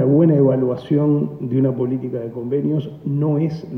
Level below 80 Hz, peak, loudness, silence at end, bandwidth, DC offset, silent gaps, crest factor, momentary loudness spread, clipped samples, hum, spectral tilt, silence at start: -58 dBFS; -4 dBFS; -19 LUFS; 0 s; 5.6 kHz; under 0.1%; none; 14 dB; 10 LU; under 0.1%; none; -11.5 dB/octave; 0 s